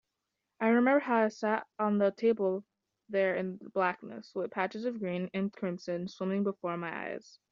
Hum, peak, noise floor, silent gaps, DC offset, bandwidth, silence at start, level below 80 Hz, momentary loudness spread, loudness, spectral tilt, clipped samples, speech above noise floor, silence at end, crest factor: none; -14 dBFS; -86 dBFS; none; under 0.1%; 7.4 kHz; 0.6 s; -80 dBFS; 11 LU; -32 LUFS; -5.5 dB/octave; under 0.1%; 54 dB; 0.35 s; 18 dB